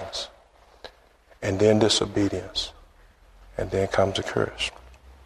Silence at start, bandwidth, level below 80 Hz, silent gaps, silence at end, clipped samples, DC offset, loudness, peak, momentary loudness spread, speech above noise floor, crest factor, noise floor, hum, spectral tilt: 0 s; 13 kHz; -48 dBFS; none; 0.1 s; under 0.1%; under 0.1%; -25 LUFS; -6 dBFS; 21 LU; 33 dB; 22 dB; -56 dBFS; none; -4.5 dB/octave